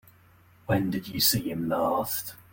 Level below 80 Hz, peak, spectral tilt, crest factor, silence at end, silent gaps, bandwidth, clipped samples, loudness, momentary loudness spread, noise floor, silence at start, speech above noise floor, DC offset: -58 dBFS; -10 dBFS; -4 dB/octave; 18 dB; 0.15 s; none; 17 kHz; under 0.1%; -27 LUFS; 8 LU; -58 dBFS; 0.7 s; 30 dB; under 0.1%